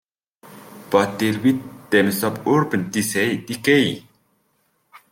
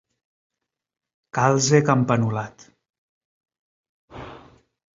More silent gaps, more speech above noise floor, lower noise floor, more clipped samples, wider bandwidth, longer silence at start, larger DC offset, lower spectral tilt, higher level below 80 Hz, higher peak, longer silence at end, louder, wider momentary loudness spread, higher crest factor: second, none vs 2.98-3.41 s, 3.59-4.08 s; first, 47 dB vs 30 dB; first, -66 dBFS vs -50 dBFS; neither; first, 17 kHz vs 7.8 kHz; second, 0.45 s vs 1.35 s; neither; about the same, -5 dB/octave vs -5.5 dB/octave; about the same, -62 dBFS vs -58 dBFS; about the same, -4 dBFS vs -2 dBFS; second, 0.15 s vs 0.55 s; about the same, -20 LUFS vs -20 LUFS; second, 6 LU vs 23 LU; about the same, 18 dB vs 22 dB